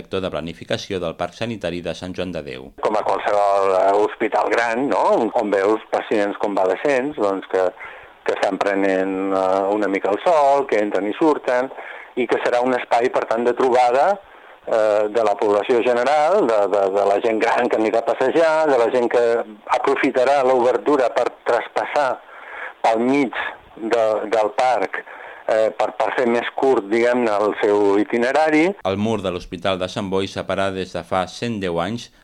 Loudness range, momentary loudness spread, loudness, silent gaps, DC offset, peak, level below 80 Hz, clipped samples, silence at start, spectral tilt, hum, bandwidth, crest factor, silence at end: 3 LU; 10 LU; -19 LUFS; none; under 0.1%; 0 dBFS; -56 dBFS; under 0.1%; 0 s; -5.5 dB/octave; none; 11 kHz; 18 dB; 0.2 s